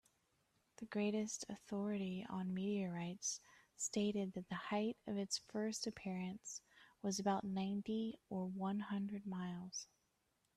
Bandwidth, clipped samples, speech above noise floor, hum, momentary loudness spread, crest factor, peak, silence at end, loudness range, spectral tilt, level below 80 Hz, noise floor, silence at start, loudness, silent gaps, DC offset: 13 kHz; under 0.1%; 40 dB; none; 8 LU; 18 dB; -26 dBFS; 0.7 s; 1 LU; -4.5 dB/octave; -78 dBFS; -83 dBFS; 0.8 s; -43 LUFS; none; under 0.1%